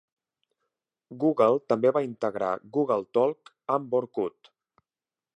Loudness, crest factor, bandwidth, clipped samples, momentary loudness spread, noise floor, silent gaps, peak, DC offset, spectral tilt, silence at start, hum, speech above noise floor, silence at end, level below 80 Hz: -26 LUFS; 18 dB; 8.2 kHz; under 0.1%; 9 LU; under -90 dBFS; none; -10 dBFS; under 0.1%; -8 dB/octave; 1.1 s; none; over 64 dB; 1.05 s; -76 dBFS